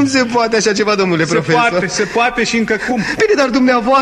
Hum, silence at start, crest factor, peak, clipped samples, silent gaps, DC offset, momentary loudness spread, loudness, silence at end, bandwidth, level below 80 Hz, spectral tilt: none; 0 s; 14 dB; 0 dBFS; under 0.1%; none; under 0.1%; 4 LU; -13 LUFS; 0 s; 12.5 kHz; -44 dBFS; -4 dB/octave